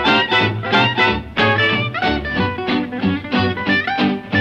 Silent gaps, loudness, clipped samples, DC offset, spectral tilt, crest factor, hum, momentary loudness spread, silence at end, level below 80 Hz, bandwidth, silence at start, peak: none; -17 LUFS; under 0.1%; under 0.1%; -6 dB/octave; 14 dB; none; 6 LU; 0 s; -40 dBFS; 8.6 kHz; 0 s; -4 dBFS